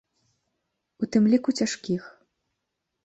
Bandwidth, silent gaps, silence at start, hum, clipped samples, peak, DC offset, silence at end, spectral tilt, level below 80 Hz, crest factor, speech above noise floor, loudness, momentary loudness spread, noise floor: 8.2 kHz; none; 1 s; none; under 0.1%; -10 dBFS; under 0.1%; 0.95 s; -5.5 dB/octave; -70 dBFS; 18 dB; 58 dB; -25 LUFS; 11 LU; -81 dBFS